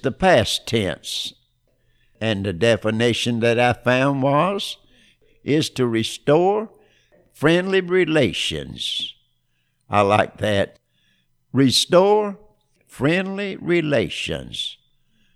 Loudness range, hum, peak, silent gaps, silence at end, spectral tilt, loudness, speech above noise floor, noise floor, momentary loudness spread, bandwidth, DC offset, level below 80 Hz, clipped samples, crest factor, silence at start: 3 LU; none; -2 dBFS; none; 0.6 s; -5 dB/octave; -20 LUFS; 48 dB; -68 dBFS; 11 LU; 15.5 kHz; under 0.1%; -50 dBFS; under 0.1%; 18 dB; 0.05 s